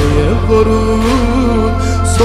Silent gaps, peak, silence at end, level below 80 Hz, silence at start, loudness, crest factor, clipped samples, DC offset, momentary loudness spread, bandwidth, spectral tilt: none; 0 dBFS; 0 s; -18 dBFS; 0 s; -12 LUFS; 10 dB; under 0.1%; under 0.1%; 3 LU; 13 kHz; -6.5 dB/octave